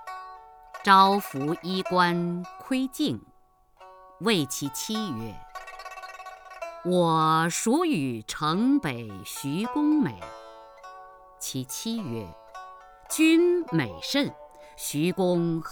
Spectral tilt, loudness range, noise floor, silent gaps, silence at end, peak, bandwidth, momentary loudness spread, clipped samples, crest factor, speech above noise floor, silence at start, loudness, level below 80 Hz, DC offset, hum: -4.5 dB/octave; 7 LU; -60 dBFS; none; 0 s; -4 dBFS; over 20 kHz; 21 LU; under 0.1%; 22 dB; 35 dB; 0 s; -25 LUFS; -60 dBFS; under 0.1%; none